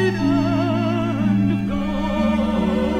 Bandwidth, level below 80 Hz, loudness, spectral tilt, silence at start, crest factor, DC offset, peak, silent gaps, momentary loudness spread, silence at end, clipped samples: 9.4 kHz; -36 dBFS; -20 LUFS; -7.5 dB/octave; 0 s; 12 dB; under 0.1%; -8 dBFS; none; 4 LU; 0 s; under 0.1%